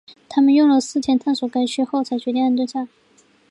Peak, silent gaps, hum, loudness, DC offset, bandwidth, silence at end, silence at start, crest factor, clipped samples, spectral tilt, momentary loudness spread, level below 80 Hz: -6 dBFS; none; none; -19 LUFS; under 0.1%; 11 kHz; 0.65 s; 0.3 s; 14 dB; under 0.1%; -4 dB/octave; 10 LU; -64 dBFS